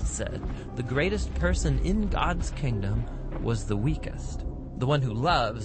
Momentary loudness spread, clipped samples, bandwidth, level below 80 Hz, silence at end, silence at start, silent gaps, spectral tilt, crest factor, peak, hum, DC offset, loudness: 11 LU; under 0.1%; 8.8 kHz; -32 dBFS; 0 s; 0 s; none; -6 dB/octave; 16 dB; -10 dBFS; none; under 0.1%; -29 LUFS